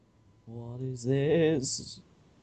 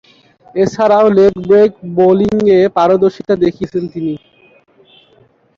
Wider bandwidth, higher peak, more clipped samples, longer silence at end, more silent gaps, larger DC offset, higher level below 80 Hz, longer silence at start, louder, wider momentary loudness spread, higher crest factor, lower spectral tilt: first, 9.2 kHz vs 7.2 kHz; second, -16 dBFS vs -2 dBFS; neither; second, 0.4 s vs 1.4 s; neither; neither; second, -60 dBFS vs -48 dBFS; about the same, 0.45 s vs 0.55 s; second, -29 LUFS vs -12 LUFS; first, 20 LU vs 11 LU; about the same, 16 dB vs 12 dB; second, -5.5 dB/octave vs -7.5 dB/octave